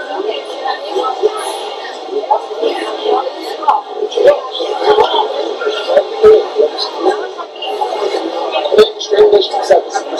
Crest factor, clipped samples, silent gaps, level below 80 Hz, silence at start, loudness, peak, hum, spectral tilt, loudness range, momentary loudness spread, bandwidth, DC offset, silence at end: 14 dB; 0.5%; none; -52 dBFS; 0 s; -14 LUFS; 0 dBFS; none; -2.5 dB/octave; 5 LU; 12 LU; 12.5 kHz; under 0.1%; 0 s